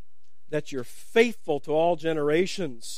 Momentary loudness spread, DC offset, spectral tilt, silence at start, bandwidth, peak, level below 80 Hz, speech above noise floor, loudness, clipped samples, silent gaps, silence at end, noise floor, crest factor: 10 LU; 2%; -5 dB/octave; 0.5 s; 15.5 kHz; -6 dBFS; -68 dBFS; 45 dB; -26 LUFS; under 0.1%; none; 0 s; -71 dBFS; 20 dB